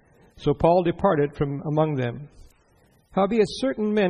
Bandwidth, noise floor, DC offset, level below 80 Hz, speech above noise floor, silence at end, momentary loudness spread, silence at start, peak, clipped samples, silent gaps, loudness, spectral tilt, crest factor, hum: 10.5 kHz; -60 dBFS; under 0.1%; -48 dBFS; 38 dB; 0 s; 9 LU; 0.4 s; -6 dBFS; under 0.1%; none; -23 LUFS; -7.5 dB/octave; 18 dB; none